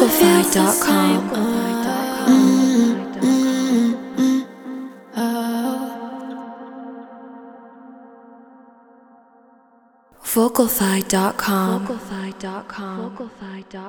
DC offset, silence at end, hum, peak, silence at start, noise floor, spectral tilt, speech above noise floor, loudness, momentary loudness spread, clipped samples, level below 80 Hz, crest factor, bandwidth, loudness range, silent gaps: under 0.1%; 0 s; none; 0 dBFS; 0 s; -54 dBFS; -4.5 dB/octave; 36 dB; -18 LUFS; 20 LU; under 0.1%; -56 dBFS; 20 dB; over 20 kHz; 16 LU; none